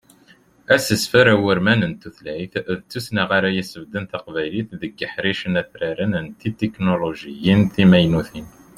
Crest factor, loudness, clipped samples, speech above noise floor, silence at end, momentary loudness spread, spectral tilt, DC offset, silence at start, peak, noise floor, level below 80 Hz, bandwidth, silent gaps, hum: 18 dB; -19 LUFS; under 0.1%; 33 dB; 0.3 s; 15 LU; -5.5 dB/octave; under 0.1%; 0.7 s; -2 dBFS; -53 dBFS; -50 dBFS; 15.5 kHz; none; none